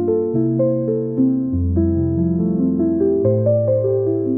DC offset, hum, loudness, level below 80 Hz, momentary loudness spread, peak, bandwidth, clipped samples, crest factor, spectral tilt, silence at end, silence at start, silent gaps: 0.2%; none; -18 LUFS; -38 dBFS; 2 LU; -6 dBFS; 2.2 kHz; under 0.1%; 12 dB; -15.5 dB/octave; 0 s; 0 s; none